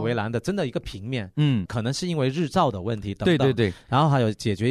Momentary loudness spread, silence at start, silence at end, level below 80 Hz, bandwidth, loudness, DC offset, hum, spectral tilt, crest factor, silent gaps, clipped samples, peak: 9 LU; 0 s; 0 s; -50 dBFS; 13 kHz; -24 LUFS; under 0.1%; none; -6.5 dB/octave; 16 dB; none; under 0.1%; -8 dBFS